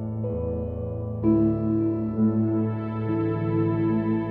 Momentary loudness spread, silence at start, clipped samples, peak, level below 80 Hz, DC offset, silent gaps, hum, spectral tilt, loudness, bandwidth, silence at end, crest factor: 8 LU; 0 s; under 0.1%; -10 dBFS; -44 dBFS; under 0.1%; none; none; -12.5 dB/octave; -25 LUFS; 4.2 kHz; 0 s; 14 dB